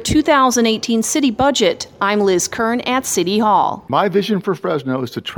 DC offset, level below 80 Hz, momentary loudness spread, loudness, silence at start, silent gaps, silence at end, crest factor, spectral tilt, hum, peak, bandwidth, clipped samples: under 0.1%; -44 dBFS; 7 LU; -16 LUFS; 0 s; none; 0 s; 14 dB; -3.5 dB/octave; none; -2 dBFS; over 20 kHz; under 0.1%